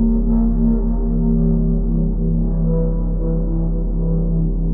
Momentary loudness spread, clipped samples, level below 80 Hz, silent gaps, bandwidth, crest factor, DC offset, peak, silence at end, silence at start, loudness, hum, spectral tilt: 4 LU; under 0.1%; -18 dBFS; none; 1.5 kHz; 10 dB; under 0.1%; -6 dBFS; 0 s; 0 s; -19 LUFS; none; -14 dB/octave